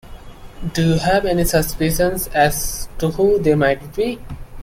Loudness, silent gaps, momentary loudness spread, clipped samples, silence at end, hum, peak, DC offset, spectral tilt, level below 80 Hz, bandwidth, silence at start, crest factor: -18 LUFS; none; 10 LU; under 0.1%; 0 s; none; -2 dBFS; under 0.1%; -5 dB/octave; -32 dBFS; 16.5 kHz; 0.05 s; 16 dB